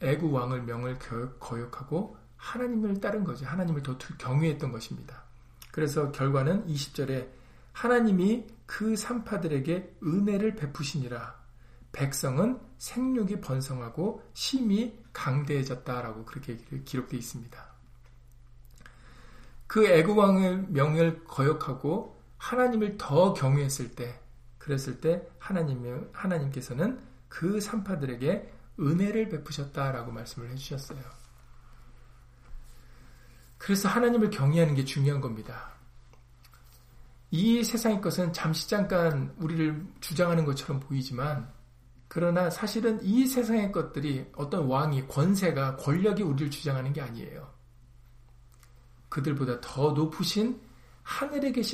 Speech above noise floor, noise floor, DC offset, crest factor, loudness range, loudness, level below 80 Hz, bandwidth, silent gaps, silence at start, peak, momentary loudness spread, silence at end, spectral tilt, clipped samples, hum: 26 dB; -55 dBFS; under 0.1%; 20 dB; 8 LU; -29 LUFS; -54 dBFS; 15.5 kHz; none; 0 s; -8 dBFS; 15 LU; 0 s; -6.5 dB/octave; under 0.1%; none